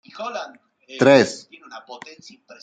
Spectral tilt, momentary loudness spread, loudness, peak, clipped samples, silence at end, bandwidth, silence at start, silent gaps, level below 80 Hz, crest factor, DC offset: -5 dB/octave; 26 LU; -18 LUFS; -2 dBFS; under 0.1%; 0.65 s; 9.2 kHz; 0.15 s; none; -68 dBFS; 20 dB; under 0.1%